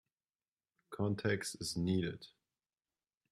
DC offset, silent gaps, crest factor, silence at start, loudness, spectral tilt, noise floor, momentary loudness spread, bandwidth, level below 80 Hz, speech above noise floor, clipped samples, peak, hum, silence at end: under 0.1%; none; 20 dB; 0.9 s; -38 LUFS; -5 dB/octave; under -90 dBFS; 17 LU; 14.5 kHz; -70 dBFS; over 53 dB; under 0.1%; -22 dBFS; none; 1.05 s